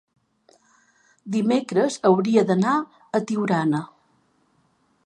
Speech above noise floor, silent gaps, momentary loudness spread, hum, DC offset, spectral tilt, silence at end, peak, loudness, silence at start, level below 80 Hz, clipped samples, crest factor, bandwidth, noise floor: 44 dB; none; 9 LU; none; under 0.1%; -6.5 dB/octave; 1.2 s; -4 dBFS; -22 LUFS; 1.25 s; -74 dBFS; under 0.1%; 20 dB; 11.5 kHz; -65 dBFS